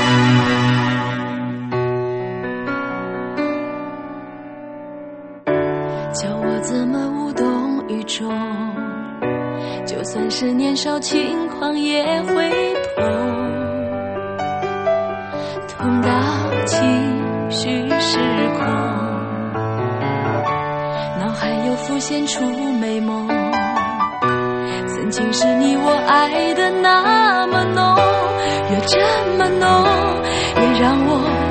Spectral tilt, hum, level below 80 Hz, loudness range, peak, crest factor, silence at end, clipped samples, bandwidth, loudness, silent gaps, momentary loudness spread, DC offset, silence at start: -5 dB/octave; none; -46 dBFS; 8 LU; 0 dBFS; 18 dB; 0 s; under 0.1%; 8.8 kHz; -18 LUFS; none; 11 LU; under 0.1%; 0 s